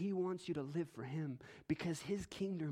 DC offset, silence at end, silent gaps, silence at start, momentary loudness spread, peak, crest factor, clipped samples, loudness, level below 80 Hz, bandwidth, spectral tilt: under 0.1%; 0 s; none; 0 s; 4 LU; -24 dBFS; 16 dB; under 0.1%; -43 LUFS; -70 dBFS; 15.5 kHz; -6.5 dB/octave